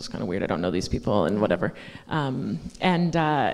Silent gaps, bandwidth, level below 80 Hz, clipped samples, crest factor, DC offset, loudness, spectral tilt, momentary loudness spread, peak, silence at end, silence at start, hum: none; 11.5 kHz; -46 dBFS; under 0.1%; 18 dB; under 0.1%; -25 LUFS; -6.5 dB/octave; 8 LU; -6 dBFS; 0 s; 0 s; none